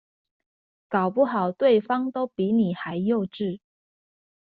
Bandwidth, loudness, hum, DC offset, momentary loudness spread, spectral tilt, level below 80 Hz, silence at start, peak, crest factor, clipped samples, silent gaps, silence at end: 4.7 kHz; -24 LUFS; none; under 0.1%; 9 LU; -6 dB/octave; -68 dBFS; 0.9 s; -8 dBFS; 18 dB; under 0.1%; none; 0.85 s